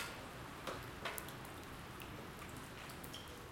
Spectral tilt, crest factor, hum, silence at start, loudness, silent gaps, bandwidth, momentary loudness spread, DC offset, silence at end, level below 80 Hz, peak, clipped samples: -3.5 dB/octave; 30 dB; none; 0 s; -49 LUFS; none; 16.5 kHz; 5 LU; under 0.1%; 0 s; -62 dBFS; -20 dBFS; under 0.1%